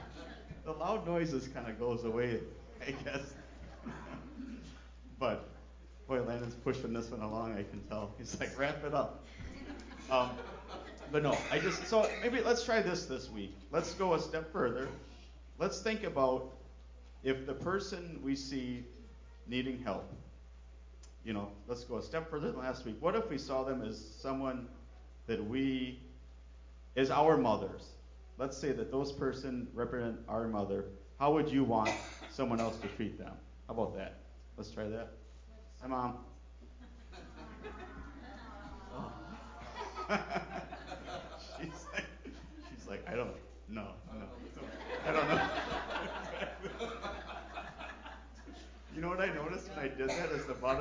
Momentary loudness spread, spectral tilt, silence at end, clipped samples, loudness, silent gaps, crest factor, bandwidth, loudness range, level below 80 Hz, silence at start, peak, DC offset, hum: 20 LU; -5.5 dB/octave; 0 s; under 0.1%; -38 LUFS; none; 22 dB; 7.6 kHz; 10 LU; -54 dBFS; 0 s; -16 dBFS; under 0.1%; none